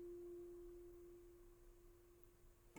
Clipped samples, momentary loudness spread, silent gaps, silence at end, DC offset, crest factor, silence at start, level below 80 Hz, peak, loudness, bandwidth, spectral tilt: under 0.1%; 13 LU; none; 0 s; under 0.1%; 18 dB; 0 s; -68 dBFS; -42 dBFS; -61 LUFS; over 20 kHz; -6.5 dB/octave